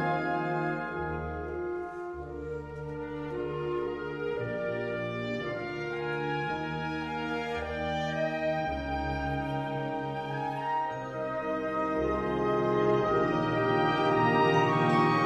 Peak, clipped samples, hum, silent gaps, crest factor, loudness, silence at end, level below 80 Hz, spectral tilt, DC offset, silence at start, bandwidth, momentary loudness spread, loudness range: -12 dBFS; under 0.1%; none; none; 18 dB; -31 LUFS; 0 s; -50 dBFS; -7 dB/octave; under 0.1%; 0 s; 11.5 kHz; 11 LU; 8 LU